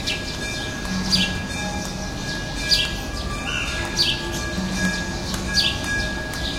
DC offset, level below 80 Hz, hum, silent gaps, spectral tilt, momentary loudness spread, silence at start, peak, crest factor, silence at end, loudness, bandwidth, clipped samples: under 0.1%; -34 dBFS; none; none; -3 dB/octave; 8 LU; 0 s; -4 dBFS; 20 dB; 0 s; -23 LUFS; 16.5 kHz; under 0.1%